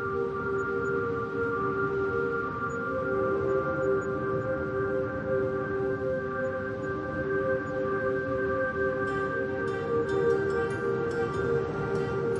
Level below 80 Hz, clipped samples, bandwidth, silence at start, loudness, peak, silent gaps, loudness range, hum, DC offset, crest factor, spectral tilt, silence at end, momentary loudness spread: -54 dBFS; under 0.1%; 10 kHz; 0 s; -29 LUFS; -16 dBFS; none; 2 LU; none; under 0.1%; 14 dB; -8 dB/octave; 0 s; 3 LU